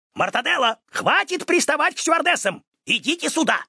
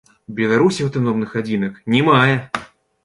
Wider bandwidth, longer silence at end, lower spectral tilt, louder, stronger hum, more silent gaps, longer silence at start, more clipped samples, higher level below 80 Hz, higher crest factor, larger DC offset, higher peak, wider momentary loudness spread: about the same, 11 kHz vs 11.5 kHz; second, 0.05 s vs 0.4 s; second, -2 dB/octave vs -6.5 dB/octave; second, -20 LUFS vs -17 LUFS; neither; first, 2.67-2.72 s vs none; second, 0.15 s vs 0.3 s; neither; second, -74 dBFS vs -56 dBFS; about the same, 18 dB vs 16 dB; neither; about the same, -4 dBFS vs -2 dBFS; second, 5 LU vs 12 LU